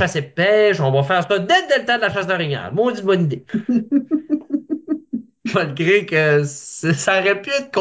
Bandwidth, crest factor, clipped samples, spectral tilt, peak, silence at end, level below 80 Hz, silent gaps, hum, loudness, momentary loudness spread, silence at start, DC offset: 8 kHz; 14 dB; under 0.1%; -5 dB/octave; -4 dBFS; 0 s; -58 dBFS; none; none; -18 LUFS; 9 LU; 0 s; under 0.1%